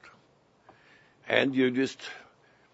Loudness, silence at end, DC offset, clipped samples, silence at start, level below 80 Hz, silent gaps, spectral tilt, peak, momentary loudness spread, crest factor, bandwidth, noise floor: -27 LUFS; 0.55 s; under 0.1%; under 0.1%; 0.05 s; -76 dBFS; none; -5 dB/octave; -6 dBFS; 18 LU; 26 dB; 8 kHz; -64 dBFS